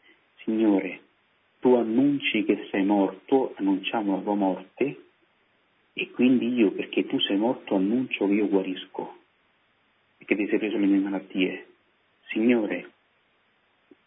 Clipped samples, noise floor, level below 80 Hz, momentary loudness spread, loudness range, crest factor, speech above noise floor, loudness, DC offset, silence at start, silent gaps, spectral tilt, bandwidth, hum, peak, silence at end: under 0.1%; -67 dBFS; -78 dBFS; 12 LU; 4 LU; 18 dB; 43 dB; -25 LUFS; under 0.1%; 0.4 s; none; -10 dB/octave; 3.9 kHz; none; -8 dBFS; 1.2 s